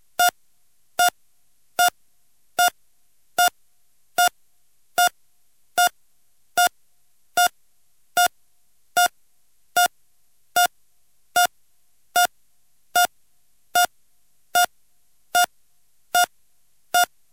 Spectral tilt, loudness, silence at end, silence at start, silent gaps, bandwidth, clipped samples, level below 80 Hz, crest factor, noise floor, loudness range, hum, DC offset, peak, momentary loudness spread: 1.5 dB/octave; -22 LUFS; 0.25 s; 0.2 s; none; 17 kHz; under 0.1%; -68 dBFS; 20 dB; -68 dBFS; 1 LU; none; 0.2%; -4 dBFS; 5 LU